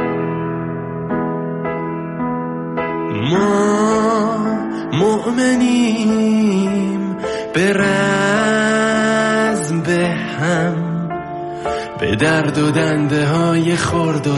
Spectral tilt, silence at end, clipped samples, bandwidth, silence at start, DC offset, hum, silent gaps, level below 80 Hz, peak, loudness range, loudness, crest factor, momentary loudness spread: -5.5 dB/octave; 0 s; under 0.1%; 11.5 kHz; 0 s; under 0.1%; none; none; -48 dBFS; -2 dBFS; 3 LU; -17 LUFS; 14 dB; 8 LU